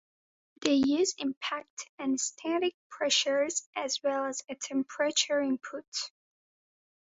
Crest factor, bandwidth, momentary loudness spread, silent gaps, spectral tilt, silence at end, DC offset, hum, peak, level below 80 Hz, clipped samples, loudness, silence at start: 20 dB; 8 kHz; 11 LU; 1.37-1.41 s, 1.70-1.77 s, 1.89-1.98 s, 2.74-2.90 s, 3.66-3.73 s, 5.88-5.92 s; -1.5 dB/octave; 1.1 s; under 0.1%; none; -10 dBFS; -74 dBFS; under 0.1%; -30 LUFS; 0.6 s